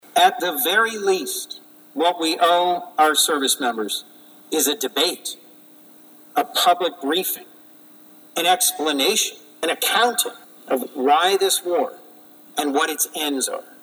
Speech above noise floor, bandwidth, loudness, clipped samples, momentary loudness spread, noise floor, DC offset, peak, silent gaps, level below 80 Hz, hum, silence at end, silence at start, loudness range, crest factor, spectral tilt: 27 dB; over 20 kHz; -20 LUFS; under 0.1%; 11 LU; -47 dBFS; under 0.1%; -4 dBFS; none; -78 dBFS; none; 0.2 s; 0.15 s; 4 LU; 18 dB; -0.5 dB/octave